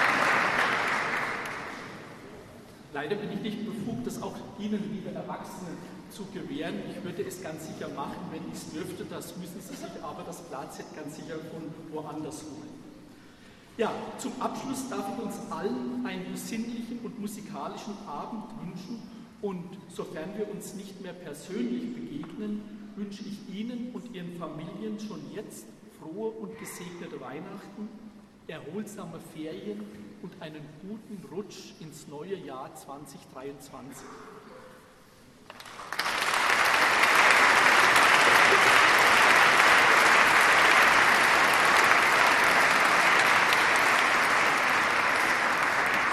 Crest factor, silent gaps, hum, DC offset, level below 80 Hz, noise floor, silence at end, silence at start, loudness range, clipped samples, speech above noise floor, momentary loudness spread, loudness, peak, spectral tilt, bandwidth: 24 dB; none; none; under 0.1%; -62 dBFS; -54 dBFS; 0 s; 0 s; 22 LU; under 0.1%; 17 dB; 24 LU; -23 LUFS; -4 dBFS; -2.5 dB/octave; 13.5 kHz